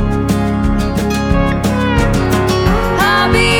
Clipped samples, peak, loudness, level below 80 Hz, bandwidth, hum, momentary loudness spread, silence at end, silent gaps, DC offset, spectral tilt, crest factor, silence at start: under 0.1%; 0 dBFS; -13 LUFS; -20 dBFS; over 20 kHz; none; 4 LU; 0 s; none; under 0.1%; -5.5 dB/octave; 12 dB; 0 s